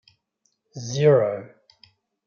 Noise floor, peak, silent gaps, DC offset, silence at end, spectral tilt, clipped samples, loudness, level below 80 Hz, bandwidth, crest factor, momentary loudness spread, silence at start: -72 dBFS; -6 dBFS; none; under 0.1%; 0.8 s; -6 dB/octave; under 0.1%; -20 LUFS; -70 dBFS; 7.2 kHz; 20 dB; 20 LU; 0.75 s